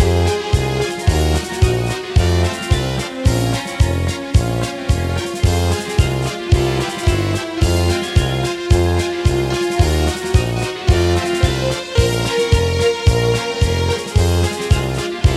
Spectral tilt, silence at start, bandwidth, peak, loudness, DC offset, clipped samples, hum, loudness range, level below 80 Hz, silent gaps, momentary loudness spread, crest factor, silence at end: -5.5 dB/octave; 0 s; 14.5 kHz; -2 dBFS; -17 LUFS; under 0.1%; under 0.1%; none; 2 LU; -22 dBFS; none; 4 LU; 14 dB; 0 s